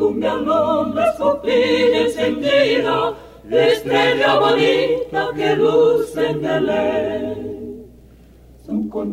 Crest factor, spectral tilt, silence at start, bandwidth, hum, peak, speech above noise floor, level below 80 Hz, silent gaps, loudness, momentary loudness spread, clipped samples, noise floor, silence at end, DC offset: 14 dB; -5.5 dB/octave; 0 s; 15 kHz; none; -4 dBFS; 29 dB; -48 dBFS; none; -17 LUFS; 10 LU; under 0.1%; -45 dBFS; 0 s; under 0.1%